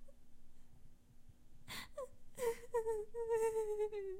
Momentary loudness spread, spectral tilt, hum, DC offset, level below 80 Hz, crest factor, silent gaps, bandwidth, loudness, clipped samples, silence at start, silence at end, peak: 13 LU; -3.5 dB/octave; none; under 0.1%; -60 dBFS; 16 dB; none; 16 kHz; -42 LUFS; under 0.1%; 0 s; 0 s; -28 dBFS